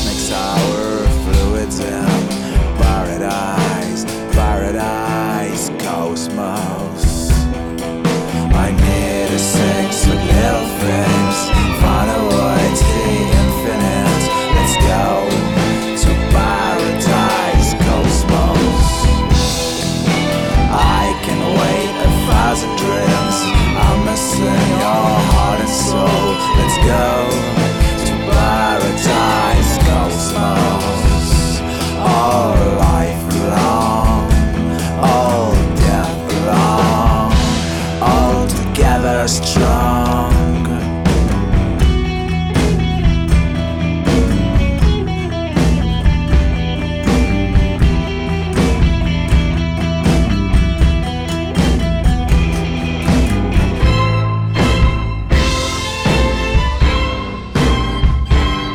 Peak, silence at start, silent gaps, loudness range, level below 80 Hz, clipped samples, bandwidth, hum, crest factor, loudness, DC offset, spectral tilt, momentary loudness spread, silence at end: -2 dBFS; 0 s; none; 3 LU; -18 dBFS; under 0.1%; 17 kHz; none; 10 dB; -15 LUFS; under 0.1%; -5.5 dB/octave; 5 LU; 0 s